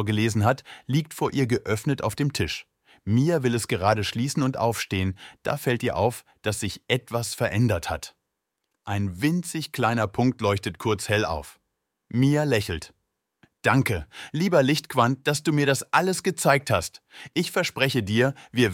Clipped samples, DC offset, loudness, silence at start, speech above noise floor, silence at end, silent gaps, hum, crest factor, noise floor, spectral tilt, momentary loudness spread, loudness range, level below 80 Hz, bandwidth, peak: under 0.1%; under 0.1%; -25 LUFS; 0 s; 56 dB; 0 s; none; none; 20 dB; -81 dBFS; -5 dB/octave; 9 LU; 4 LU; -52 dBFS; 17 kHz; -4 dBFS